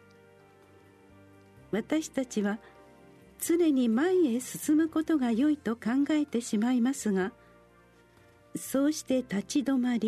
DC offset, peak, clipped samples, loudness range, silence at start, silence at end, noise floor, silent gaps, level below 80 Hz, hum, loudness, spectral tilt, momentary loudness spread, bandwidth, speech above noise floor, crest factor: under 0.1%; -14 dBFS; under 0.1%; 5 LU; 1.7 s; 0 s; -60 dBFS; none; -68 dBFS; none; -29 LUFS; -5 dB/octave; 8 LU; 13.5 kHz; 32 dB; 14 dB